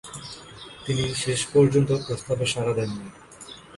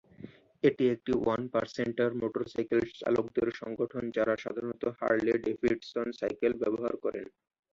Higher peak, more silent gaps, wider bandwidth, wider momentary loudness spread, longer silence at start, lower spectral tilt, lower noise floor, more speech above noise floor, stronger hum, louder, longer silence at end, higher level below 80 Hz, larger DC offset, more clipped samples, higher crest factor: first, -6 dBFS vs -12 dBFS; neither; first, 11.5 kHz vs 7.4 kHz; first, 22 LU vs 8 LU; second, 0.05 s vs 0.2 s; second, -5 dB/octave vs -7 dB/octave; second, -45 dBFS vs -51 dBFS; about the same, 21 dB vs 20 dB; neither; first, -24 LUFS vs -31 LUFS; second, 0 s vs 0.5 s; first, -52 dBFS vs -64 dBFS; neither; neither; about the same, 18 dB vs 20 dB